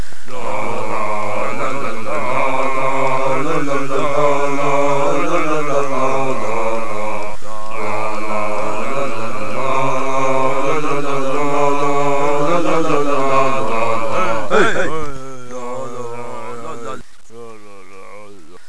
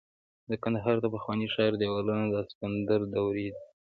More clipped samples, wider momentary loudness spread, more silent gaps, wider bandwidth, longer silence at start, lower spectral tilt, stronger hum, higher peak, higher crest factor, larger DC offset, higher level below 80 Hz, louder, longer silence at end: neither; first, 13 LU vs 7 LU; second, none vs 2.55-2.61 s; first, 11 kHz vs 4.9 kHz; second, 0 s vs 0.5 s; second, -5 dB/octave vs -9.5 dB/octave; neither; first, 0 dBFS vs -14 dBFS; about the same, 14 dB vs 18 dB; first, 30% vs under 0.1%; first, -50 dBFS vs -60 dBFS; first, -19 LUFS vs -30 LUFS; second, 0 s vs 0.15 s